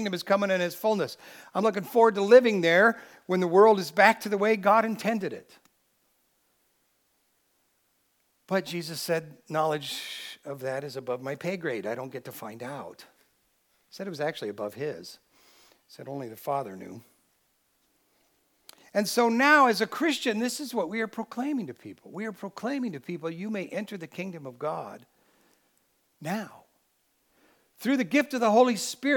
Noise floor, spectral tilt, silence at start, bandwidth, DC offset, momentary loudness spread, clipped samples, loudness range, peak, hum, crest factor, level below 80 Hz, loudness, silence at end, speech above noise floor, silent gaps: -72 dBFS; -4.5 dB/octave; 0 s; 19 kHz; under 0.1%; 19 LU; under 0.1%; 16 LU; -4 dBFS; none; 24 dB; -84 dBFS; -26 LUFS; 0 s; 45 dB; none